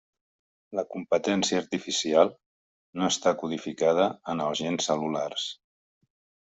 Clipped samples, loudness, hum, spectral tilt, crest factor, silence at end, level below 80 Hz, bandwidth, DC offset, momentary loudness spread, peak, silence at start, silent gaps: under 0.1%; -27 LUFS; none; -3.5 dB/octave; 22 dB; 1 s; -70 dBFS; 8.2 kHz; under 0.1%; 10 LU; -6 dBFS; 0.7 s; 2.46-2.93 s